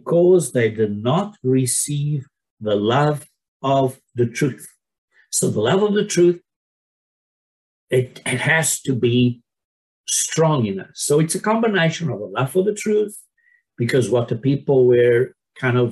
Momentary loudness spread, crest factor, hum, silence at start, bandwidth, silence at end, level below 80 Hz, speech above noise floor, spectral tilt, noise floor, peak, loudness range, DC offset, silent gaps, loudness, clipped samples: 9 LU; 14 dB; none; 0.05 s; 13 kHz; 0 s; -62 dBFS; 43 dB; -5 dB/octave; -61 dBFS; -4 dBFS; 2 LU; under 0.1%; 2.51-2.57 s, 3.48-3.60 s, 4.98-5.08 s, 6.56-7.87 s, 9.65-10.04 s; -19 LUFS; under 0.1%